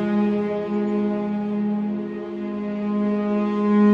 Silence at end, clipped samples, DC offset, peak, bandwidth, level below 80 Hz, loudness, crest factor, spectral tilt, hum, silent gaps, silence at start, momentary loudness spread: 0 s; under 0.1%; under 0.1%; -8 dBFS; 4.8 kHz; -62 dBFS; -23 LUFS; 14 dB; -9.5 dB/octave; none; none; 0 s; 7 LU